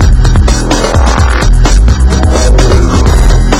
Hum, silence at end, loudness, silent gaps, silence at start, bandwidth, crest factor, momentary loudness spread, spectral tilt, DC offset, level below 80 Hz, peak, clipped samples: none; 0 s; -8 LUFS; none; 0 s; 12.5 kHz; 6 dB; 1 LU; -5.5 dB/octave; under 0.1%; -6 dBFS; 0 dBFS; 6%